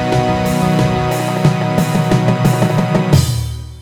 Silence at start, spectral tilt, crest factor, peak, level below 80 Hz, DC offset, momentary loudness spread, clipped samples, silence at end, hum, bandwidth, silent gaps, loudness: 0 s; -6.5 dB/octave; 14 dB; 0 dBFS; -32 dBFS; under 0.1%; 4 LU; under 0.1%; 0 s; none; 18.5 kHz; none; -14 LUFS